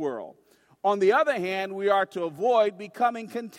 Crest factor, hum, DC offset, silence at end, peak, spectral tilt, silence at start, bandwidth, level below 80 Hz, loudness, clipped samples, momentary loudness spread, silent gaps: 16 dB; none; under 0.1%; 0 s; -10 dBFS; -5 dB/octave; 0 s; 15.5 kHz; -78 dBFS; -25 LUFS; under 0.1%; 11 LU; none